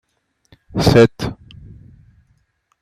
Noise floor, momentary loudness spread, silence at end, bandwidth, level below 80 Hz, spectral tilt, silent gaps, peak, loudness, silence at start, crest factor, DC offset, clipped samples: -63 dBFS; 17 LU; 1.5 s; 15 kHz; -38 dBFS; -6.5 dB/octave; none; -2 dBFS; -15 LUFS; 0.75 s; 18 dB; under 0.1%; under 0.1%